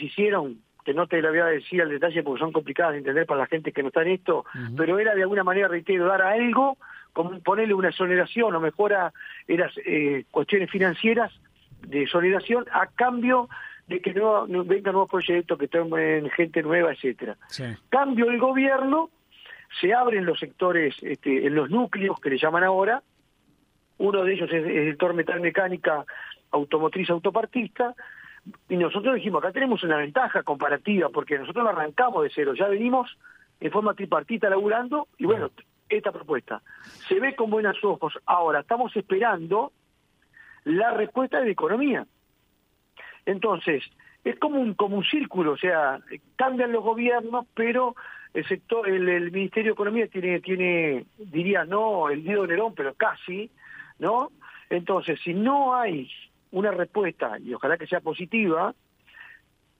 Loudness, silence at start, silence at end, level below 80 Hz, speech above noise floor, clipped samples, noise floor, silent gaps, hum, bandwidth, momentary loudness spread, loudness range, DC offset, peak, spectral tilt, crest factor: -24 LUFS; 0 s; 0.45 s; -72 dBFS; 43 dB; under 0.1%; -68 dBFS; none; none; 7 kHz; 9 LU; 4 LU; under 0.1%; -8 dBFS; -7.5 dB/octave; 18 dB